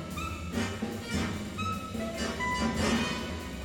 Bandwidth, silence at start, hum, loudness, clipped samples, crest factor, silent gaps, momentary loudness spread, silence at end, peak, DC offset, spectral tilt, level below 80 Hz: 18 kHz; 0 s; none; -32 LUFS; under 0.1%; 16 dB; none; 8 LU; 0 s; -16 dBFS; under 0.1%; -4.5 dB/octave; -44 dBFS